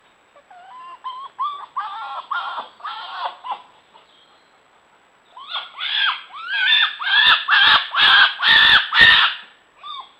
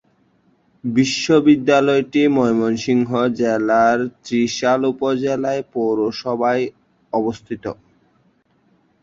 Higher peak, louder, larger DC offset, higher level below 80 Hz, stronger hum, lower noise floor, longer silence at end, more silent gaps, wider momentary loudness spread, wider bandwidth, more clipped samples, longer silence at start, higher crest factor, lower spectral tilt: about the same, 0 dBFS vs -2 dBFS; first, -13 LUFS vs -18 LUFS; neither; about the same, -54 dBFS vs -58 dBFS; neither; second, -55 dBFS vs -60 dBFS; second, 0.2 s vs 1.3 s; neither; first, 22 LU vs 10 LU; first, 17.5 kHz vs 7.8 kHz; neither; second, 0.7 s vs 0.85 s; about the same, 20 dB vs 16 dB; second, -1 dB/octave vs -5.5 dB/octave